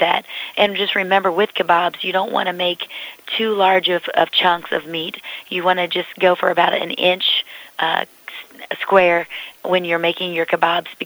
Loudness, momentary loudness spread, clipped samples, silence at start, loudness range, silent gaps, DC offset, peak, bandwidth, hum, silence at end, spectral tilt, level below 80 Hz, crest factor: -18 LUFS; 13 LU; under 0.1%; 0 s; 1 LU; none; under 0.1%; 0 dBFS; over 20 kHz; none; 0 s; -4.5 dB/octave; -66 dBFS; 18 dB